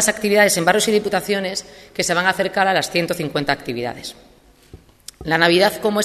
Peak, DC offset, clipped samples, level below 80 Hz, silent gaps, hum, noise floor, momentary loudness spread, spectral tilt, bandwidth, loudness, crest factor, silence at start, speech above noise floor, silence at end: 0 dBFS; under 0.1%; under 0.1%; -52 dBFS; none; none; -46 dBFS; 14 LU; -3 dB/octave; 14 kHz; -18 LUFS; 20 dB; 0 s; 27 dB; 0 s